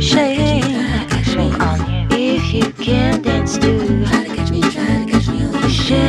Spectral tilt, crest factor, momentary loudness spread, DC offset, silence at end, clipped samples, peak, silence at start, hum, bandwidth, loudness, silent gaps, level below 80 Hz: -5.5 dB/octave; 14 dB; 3 LU; under 0.1%; 0 s; under 0.1%; 0 dBFS; 0 s; none; 12 kHz; -16 LUFS; none; -26 dBFS